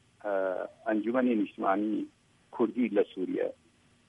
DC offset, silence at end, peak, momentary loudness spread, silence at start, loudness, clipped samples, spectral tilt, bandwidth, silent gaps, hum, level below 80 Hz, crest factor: under 0.1%; 0.55 s; -14 dBFS; 8 LU; 0.25 s; -31 LUFS; under 0.1%; -8 dB/octave; 8.2 kHz; none; none; -78 dBFS; 16 dB